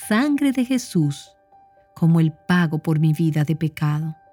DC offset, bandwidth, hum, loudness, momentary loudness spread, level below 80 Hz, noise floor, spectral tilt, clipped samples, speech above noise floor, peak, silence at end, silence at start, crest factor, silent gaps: under 0.1%; 16 kHz; none; -21 LUFS; 5 LU; -60 dBFS; -53 dBFS; -7 dB/octave; under 0.1%; 34 dB; -6 dBFS; 0.2 s; 0 s; 14 dB; none